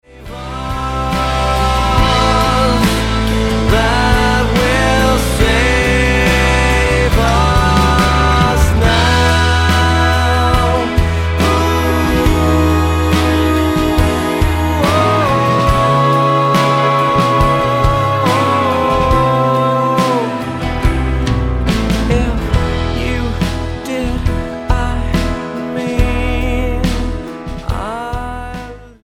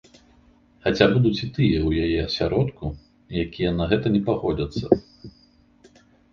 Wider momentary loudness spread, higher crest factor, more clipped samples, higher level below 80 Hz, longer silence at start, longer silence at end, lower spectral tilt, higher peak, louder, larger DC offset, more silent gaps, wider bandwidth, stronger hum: about the same, 9 LU vs 10 LU; second, 12 dB vs 22 dB; neither; first, -20 dBFS vs -40 dBFS; second, 0.15 s vs 0.85 s; second, 0.15 s vs 1.05 s; second, -5.5 dB/octave vs -7.5 dB/octave; about the same, 0 dBFS vs 0 dBFS; first, -13 LUFS vs -23 LUFS; neither; neither; first, 16 kHz vs 7.2 kHz; neither